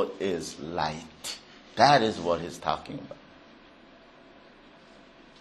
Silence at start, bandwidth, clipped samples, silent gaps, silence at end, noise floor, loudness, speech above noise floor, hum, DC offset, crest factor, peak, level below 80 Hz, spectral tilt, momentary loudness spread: 0 s; 12.5 kHz; under 0.1%; none; 2.2 s; -53 dBFS; -27 LUFS; 26 dB; none; under 0.1%; 26 dB; -4 dBFS; -60 dBFS; -4 dB/octave; 21 LU